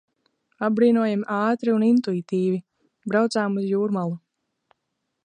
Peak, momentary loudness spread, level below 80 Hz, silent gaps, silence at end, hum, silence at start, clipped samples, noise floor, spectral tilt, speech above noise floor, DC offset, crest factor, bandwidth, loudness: -8 dBFS; 10 LU; -74 dBFS; none; 1.05 s; none; 0.6 s; under 0.1%; -78 dBFS; -7 dB/octave; 57 dB; under 0.1%; 16 dB; 9.8 kHz; -23 LUFS